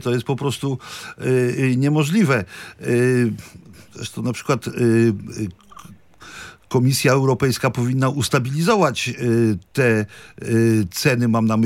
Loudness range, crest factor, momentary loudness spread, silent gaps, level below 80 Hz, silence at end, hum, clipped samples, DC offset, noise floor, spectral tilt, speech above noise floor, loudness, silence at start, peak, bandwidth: 4 LU; 16 dB; 14 LU; none; -56 dBFS; 0 s; none; under 0.1%; under 0.1%; -44 dBFS; -6 dB/octave; 25 dB; -19 LUFS; 0 s; -4 dBFS; 16.5 kHz